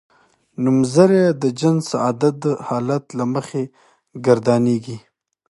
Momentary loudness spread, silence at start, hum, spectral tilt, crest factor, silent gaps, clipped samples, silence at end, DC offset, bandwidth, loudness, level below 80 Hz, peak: 13 LU; 0.6 s; none; -7 dB/octave; 18 dB; none; under 0.1%; 0.5 s; under 0.1%; 11.5 kHz; -18 LUFS; -64 dBFS; 0 dBFS